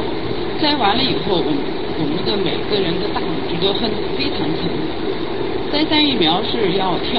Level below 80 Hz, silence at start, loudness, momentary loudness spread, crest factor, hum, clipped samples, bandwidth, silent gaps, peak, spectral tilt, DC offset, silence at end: -40 dBFS; 0 s; -19 LUFS; 8 LU; 18 dB; none; under 0.1%; 5.8 kHz; none; 0 dBFS; -8.5 dB/octave; 6%; 0 s